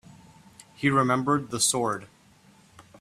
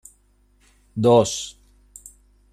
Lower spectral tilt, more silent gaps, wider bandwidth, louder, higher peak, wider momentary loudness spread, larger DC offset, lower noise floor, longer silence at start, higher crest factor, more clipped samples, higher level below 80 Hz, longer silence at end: second, -3.5 dB/octave vs -5.5 dB/octave; neither; about the same, 15 kHz vs 14.5 kHz; second, -25 LUFS vs -19 LUFS; second, -8 dBFS vs -4 dBFS; second, 7 LU vs 27 LU; neither; about the same, -57 dBFS vs -60 dBFS; second, 0.8 s vs 0.95 s; about the same, 20 dB vs 20 dB; neither; second, -64 dBFS vs -56 dBFS; about the same, 0.95 s vs 1 s